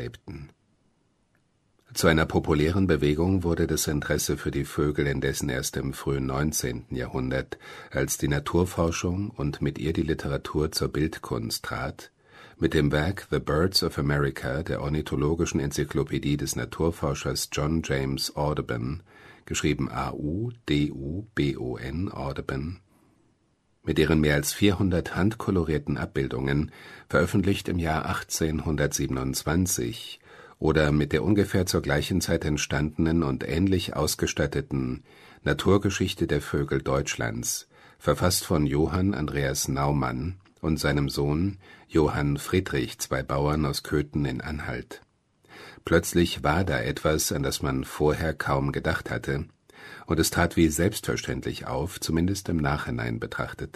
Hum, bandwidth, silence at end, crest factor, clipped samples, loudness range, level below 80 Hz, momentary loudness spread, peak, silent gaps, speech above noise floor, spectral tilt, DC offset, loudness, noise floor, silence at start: none; 13.5 kHz; 0.05 s; 22 dB; under 0.1%; 4 LU; -40 dBFS; 9 LU; -4 dBFS; none; 42 dB; -5 dB/octave; under 0.1%; -27 LUFS; -68 dBFS; 0 s